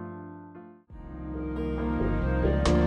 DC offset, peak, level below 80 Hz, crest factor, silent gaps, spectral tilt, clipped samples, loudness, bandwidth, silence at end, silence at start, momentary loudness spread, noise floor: under 0.1%; -12 dBFS; -34 dBFS; 16 dB; none; -7 dB/octave; under 0.1%; -29 LUFS; 10 kHz; 0 s; 0 s; 22 LU; -48 dBFS